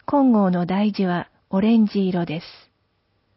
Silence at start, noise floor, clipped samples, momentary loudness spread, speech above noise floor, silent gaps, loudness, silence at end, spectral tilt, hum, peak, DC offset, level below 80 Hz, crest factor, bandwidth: 0.1 s; -68 dBFS; under 0.1%; 10 LU; 48 dB; none; -20 LUFS; 0.85 s; -11.5 dB/octave; none; -8 dBFS; under 0.1%; -58 dBFS; 14 dB; 5.8 kHz